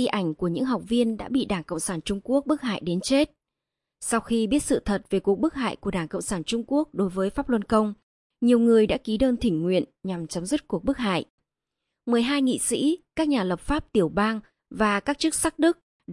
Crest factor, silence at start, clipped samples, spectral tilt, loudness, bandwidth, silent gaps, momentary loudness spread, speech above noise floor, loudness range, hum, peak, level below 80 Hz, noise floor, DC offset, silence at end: 18 dB; 0 s; under 0.1%; -5 dB/octave; -25 LUFS; 11.5 kHz; 8.03-8.30 s, 11.30-11.38 s, 15.83-16.00 s; 7 LU; 62 dB; 3 LU; none; -8 dBFS; -46 dBFS; -86 dBFS; under 0.1%; 0 s